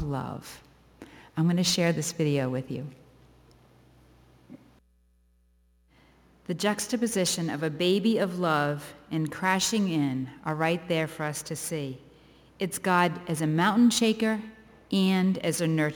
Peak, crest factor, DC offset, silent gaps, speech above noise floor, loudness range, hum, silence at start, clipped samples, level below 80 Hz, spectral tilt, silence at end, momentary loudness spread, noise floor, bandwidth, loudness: -10 dBFS; 20 dB; under 0.1%; none; 38 dB; 9 LU; none; 0 s; under 0.1%; -62 dBFS; -4.5 dB/octave; 0 s; 13 LU; -65 dBFS; over 20 kHz; -27 LUFS